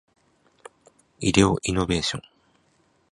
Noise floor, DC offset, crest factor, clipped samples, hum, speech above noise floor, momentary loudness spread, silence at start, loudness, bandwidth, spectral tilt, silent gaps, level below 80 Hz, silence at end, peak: -65 dBFS; under 0.1%; 24 dB; under 0.1%; none; 43 dB; 9 LU; 1.2 s; -23 LUFS; 11.5 kHz; -4.5 dB/octave; none; -44 dBFS; 0.9 s; -2 dBFS